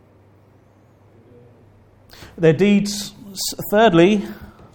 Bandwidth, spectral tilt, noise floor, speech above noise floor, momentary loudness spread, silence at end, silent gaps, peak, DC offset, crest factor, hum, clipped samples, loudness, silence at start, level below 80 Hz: 19 kHz; -5.5 dB/octave; -52 dBFS; 36 dB; 17 LU; 0.3 s; none; -2 dBFS; under 0.1%; 18 dB; none; under 0.1%; -17 LUFS; 2.2 s; -50 dBFS